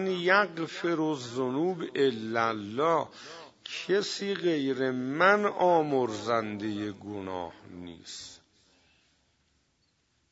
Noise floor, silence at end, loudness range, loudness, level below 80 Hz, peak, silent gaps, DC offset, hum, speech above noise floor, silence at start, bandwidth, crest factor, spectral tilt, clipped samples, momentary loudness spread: -72 dBFS; 1.95 s; 13 LU; -28 LUFS; -74 dBFS; -8 dBFS; none; under 0.1%; none; 44 dB; 0 s; 8 kHz; 22 dB; -5 dB/octave; under 0.1%; 18 LU